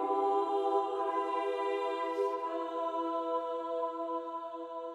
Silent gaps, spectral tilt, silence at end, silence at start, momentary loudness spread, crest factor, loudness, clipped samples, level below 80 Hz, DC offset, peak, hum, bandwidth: none; -4 dB/octave; 0 s; 0 s; 7 LU; 16 dB; -34 LUFS; under 0.1%; -84 dBFS; under 0.1%; -18 dBFS; none; 10.5 kHz